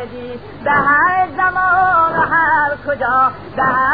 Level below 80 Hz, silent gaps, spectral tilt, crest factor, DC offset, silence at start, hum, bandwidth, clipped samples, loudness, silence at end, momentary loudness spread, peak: -46 dBFS; none; -8.5 dB/octave; 12 dB; 0.7%; 0 s; 50 Hz at -40 dBFS; 5 kHz; under 0.1%; -14 LUFS; 0 s; 9 LU; -2 dBFS